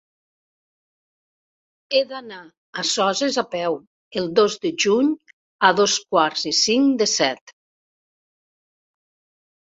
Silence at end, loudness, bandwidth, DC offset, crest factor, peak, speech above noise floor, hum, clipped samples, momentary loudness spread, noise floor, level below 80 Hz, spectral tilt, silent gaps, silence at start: 2.15 s; -20 LUFS; 8.2 kHz; under 0.1%; 22 dB; -2 dBFS; over 70 dB; none; under 0.1%; 14 LU; under -90 dBFS; -68 dBFS; -2.5 dB/octave; 2.57-2.73 s, 3.87-4.11 s, 5.33-5.59 s, 7.41-7.47 s; 1.9 s